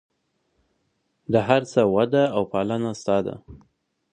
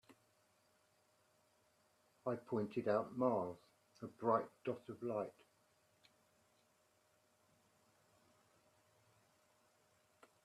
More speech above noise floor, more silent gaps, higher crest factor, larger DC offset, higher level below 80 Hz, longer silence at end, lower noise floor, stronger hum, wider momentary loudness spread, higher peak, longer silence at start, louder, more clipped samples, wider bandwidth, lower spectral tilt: first, 50 dB vs 36 dB; neither; about the same, 22 dB vs 24 dB; neither; first, -56 dBFS vs -88 dBFS; second, 0.55 s vs 5.15 s; second, -72 dBFS vs -77 dBFS; neither; about the same, 11 LU vs 12 LU; first, -2 dBFS vs -22 dBFS; first, 1.3 s vs 0.1 s; first, -22 LUFS vs -42 LUFS; neither; second, 9.8 kHz vs 13.5 kHz; second, -6.5 dB/octave vs -8 dB/octave